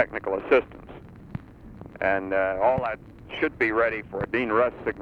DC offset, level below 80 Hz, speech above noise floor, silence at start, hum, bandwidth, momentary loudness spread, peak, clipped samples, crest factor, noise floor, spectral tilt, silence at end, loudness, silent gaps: under 0.1%; -50 dBFS; 19 dB; 0 s; none; 6.8 kHz; 21 LU; -6 dBFS; under 0.1%; 20 dB; -44 dBFS; -7.5 dB/octave; 0 s; -25 LUFS; none